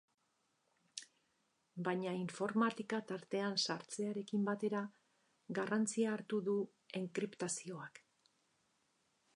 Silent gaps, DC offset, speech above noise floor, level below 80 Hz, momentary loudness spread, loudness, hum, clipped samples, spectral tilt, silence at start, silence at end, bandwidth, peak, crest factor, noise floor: none; under 0.1%; 42 dB; under -90 dBFS; 14 LU; -40 LUFS; none; under 0.1%; -4.5 dB/octave; 0.95 s; 1.4 s; 11 kHz; -22 dBFS; 20 dB; -82 dBFS